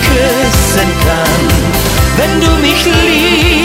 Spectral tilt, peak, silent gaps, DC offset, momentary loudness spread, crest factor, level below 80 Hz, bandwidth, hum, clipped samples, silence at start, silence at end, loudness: -4 dB/octave; 0 dBFS; none; under 0.1%; 3 LU; 10 dB; -16 dBFS; 16.5 kHz; none; under 0.1%; 0 s; 0 s; -9 LUFS